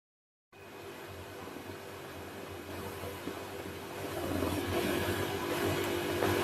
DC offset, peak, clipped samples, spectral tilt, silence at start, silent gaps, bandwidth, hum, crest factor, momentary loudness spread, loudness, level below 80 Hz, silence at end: under 0.1%; -16 dBFS; under 0.1%; -4.5 dB/octave; 0.55 s; none; 16 kHz; none; 20 dB; 13 LU; -37 LUFS; -62 dBFS; 0 s